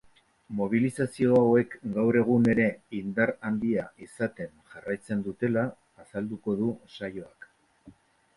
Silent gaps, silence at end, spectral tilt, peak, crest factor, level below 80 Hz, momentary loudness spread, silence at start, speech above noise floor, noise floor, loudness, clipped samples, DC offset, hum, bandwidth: none; 0.45 s; -8 dB/octave; -10 dBFS; 18 dB; -62 dBFS; 16 LU; 0.5 s; 29 dB; -56 dBFS; -28 LUFS; under 0.1%; under 0.1%; none; 11.5 kHz